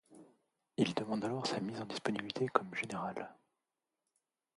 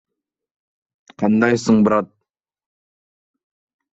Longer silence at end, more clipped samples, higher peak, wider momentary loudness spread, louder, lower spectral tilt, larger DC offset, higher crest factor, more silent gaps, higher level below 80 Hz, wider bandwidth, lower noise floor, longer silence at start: second, 1.2 s vs 1.9 s; neither; second, -10 dBFS vs -2 dBFS; about the same, 9 LU vs 8 LU; second, -38 LUFS vs -17 LUFS; second, -5 dB/octave vs -6.5 dB/octave; neither; first, 30 dB vs 20 dB; neither; second, -78 dBFS vs -58 dBFS; first, 11.5 kHz vs 8 kHz; first, -89 dBFS vs -78 dBFS; second, 0.1 s vs 1.2 s